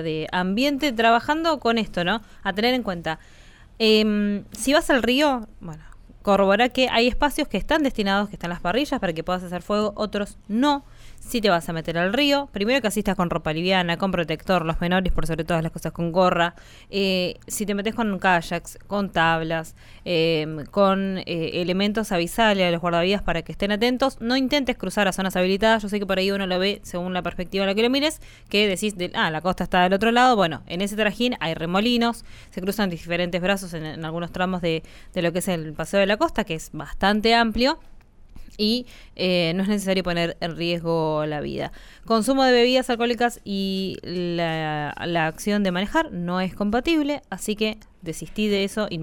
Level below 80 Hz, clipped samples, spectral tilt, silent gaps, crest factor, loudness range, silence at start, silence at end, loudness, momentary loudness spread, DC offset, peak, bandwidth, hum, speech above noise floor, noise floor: -40 dBFS; under 0.1%; -5 dB/octave; none; 16 dB; 3 LU; 0 s; 0 s; -23 LUFS; 10 LU; under 0.1%; -6 dBFS; 19 kHz; none; 19 dB; -42 dBFS